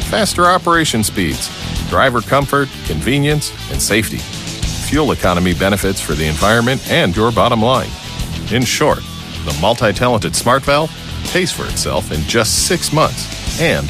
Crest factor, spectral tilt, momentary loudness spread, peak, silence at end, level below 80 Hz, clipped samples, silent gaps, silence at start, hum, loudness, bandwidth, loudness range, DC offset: 14 dB; -4 dB/octave; 9 LU; 0 dBFS; 0 s; -30 dBFS; under 0.1%; none; 0 s; none; -15 LUFS; 15.5 kHz; 2 LU; under 0.1%